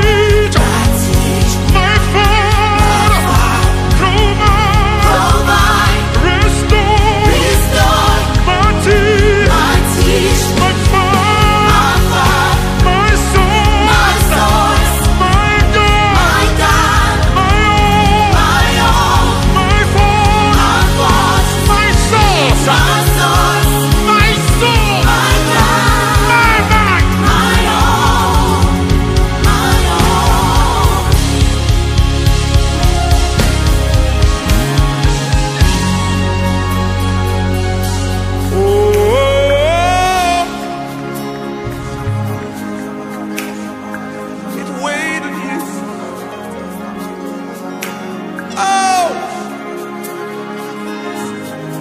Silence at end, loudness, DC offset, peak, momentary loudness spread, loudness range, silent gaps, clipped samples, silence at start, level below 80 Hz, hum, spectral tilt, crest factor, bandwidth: 0 s; -11 LUFS; under 0.1%; 0 dBFS; 13 LU; 11 LU; none; under 0.1%; 0 s; -16 dBFS; none; -4.5 dB/octave; 10 dB; 15.5 kHz